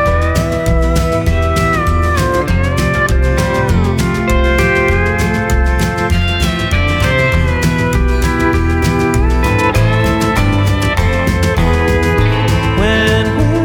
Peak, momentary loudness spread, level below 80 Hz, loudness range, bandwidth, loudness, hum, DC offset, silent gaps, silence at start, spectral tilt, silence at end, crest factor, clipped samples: 0 dBFS; 2 LU; -18 dBFS; 1 LU; 18.5 kHz; -13 LUFS; none; under 0.1%; none; 0 s; -6 dB/octave; 0 s; 12 dB; under 0.1%